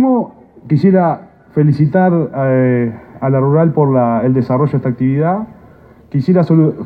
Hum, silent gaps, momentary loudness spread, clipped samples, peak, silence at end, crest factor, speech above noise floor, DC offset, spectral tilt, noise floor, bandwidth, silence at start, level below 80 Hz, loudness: none; none; 10 LU; under 0.1%; 0 dBFS; 0 s; 12 dB; 29 dB; under 0.1%; -11.5 dB/octave; -41 dBFS; 5 kHz; 0 s; -50 dBFS; -13 LUFS